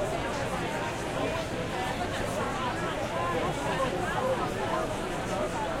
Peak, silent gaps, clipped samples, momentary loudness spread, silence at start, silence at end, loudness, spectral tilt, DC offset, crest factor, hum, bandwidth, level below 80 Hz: -16 dBFS; none; under 0.1%; 3 LU; 0 s; 0 s; -31 LUFS; -5 dB/octave; under 0.1%; 14 dB; none; 16.5 kHz; -46 dBFS